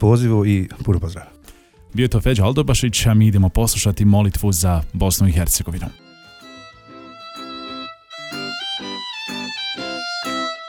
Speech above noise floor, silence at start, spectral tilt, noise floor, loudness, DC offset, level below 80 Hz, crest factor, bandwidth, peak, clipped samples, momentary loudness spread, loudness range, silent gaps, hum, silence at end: 30 dB; 0 s; -5 dB/octave; -46 dBFS; -19 LUFS; under 0.1%; -30 dBFS; 16 dB; 19 kHz; -2 dBFS; under 0.1%; 18 LU; 13 LU; none; none; 0 s